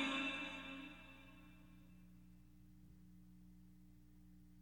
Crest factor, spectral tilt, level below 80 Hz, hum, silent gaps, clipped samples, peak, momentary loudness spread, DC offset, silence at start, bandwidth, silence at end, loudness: 24 dB; -4 dB/octave; -70 dBFS; 60 Hz at -65 dBFS; none; under 0.1%; -28 dBFS; 23 LU; under 0.1%; 0 s; 16.5 kHz; 0 s; -47 LUFS